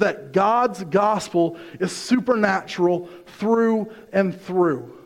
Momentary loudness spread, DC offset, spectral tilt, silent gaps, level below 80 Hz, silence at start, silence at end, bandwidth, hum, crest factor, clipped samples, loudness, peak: 8 LU; under 0.1%; -6 dB/octave; none; -64 dBFS; 0 s; 0.05 s; 15 kHz; none; 18 dB; under 0.1%; -21 LUFS; -4 dBFS